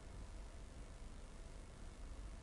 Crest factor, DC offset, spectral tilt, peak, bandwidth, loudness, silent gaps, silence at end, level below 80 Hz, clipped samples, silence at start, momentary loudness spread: 10 dB; under 0.1%; -5 dB/octave; -42 dBFS; 11.5 kHz; -57 LUFS; none; 0 s; -54 dBFS; under 0.1%; 0 s; 2 LU